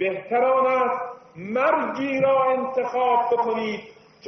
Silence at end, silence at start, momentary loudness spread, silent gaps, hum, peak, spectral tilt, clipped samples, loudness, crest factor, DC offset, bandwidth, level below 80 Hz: 0 s; 0 s; 11 LU; none; none; -6 dBFS; -3.5 dB/octave; under 0.1%; -22 LUFS; 16 dB; under 0.1%; 6.2 kHz; -68 dBFS